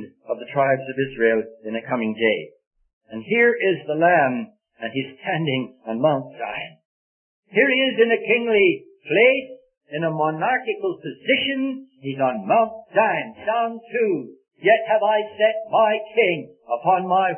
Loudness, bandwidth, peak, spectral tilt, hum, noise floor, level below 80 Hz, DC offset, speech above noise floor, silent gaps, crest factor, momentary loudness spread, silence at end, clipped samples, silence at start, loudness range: -21 LUFS; 3.4 kHz; -4 dBFS; -10 dB/octave; none; under -90 dBFS; -66 dBFS; under 0.1%; over 69 dB; 2.67-2.71 s, 2.93-3.01 s, 6.85-7.43 s, 9.77-9.81 s; 18 dB; 13 LU; 0 s; under 0.1%; 0 s; 4 LU